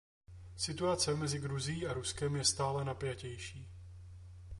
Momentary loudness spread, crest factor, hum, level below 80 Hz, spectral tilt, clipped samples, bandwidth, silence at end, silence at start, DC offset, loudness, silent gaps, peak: 21 LU; 20 dB; none; -56 dBFS; -4 dB/octave; under 0.1%; 11.5 kHz; 0 s; 0.3 s; under 0.1%; -36 LUFS; none; -18 dBFS